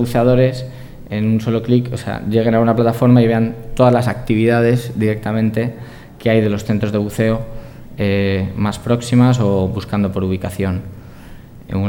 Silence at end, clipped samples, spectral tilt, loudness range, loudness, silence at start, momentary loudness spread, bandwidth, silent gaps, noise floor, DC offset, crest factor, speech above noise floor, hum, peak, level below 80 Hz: 0 s; under 0.1%; -7.5 dB/octave; 4 LU; -16 LUFS; 0 s; 12 LU; 16.5 kHz; none; -36 dBFS; under 0.1%; 16 dB; 21 dB; none; 0 dBFS; -38 dBFS